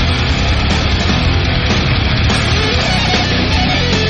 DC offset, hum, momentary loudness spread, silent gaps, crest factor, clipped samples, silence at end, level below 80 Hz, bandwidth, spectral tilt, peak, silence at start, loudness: under 0.1%; none; 1 LU; none; 12 dB; under 0.1%; 0 s; -20 dBFS; 9 kHz; -5 dB/octave; 0 dBFS; 0 s; -13 LUFS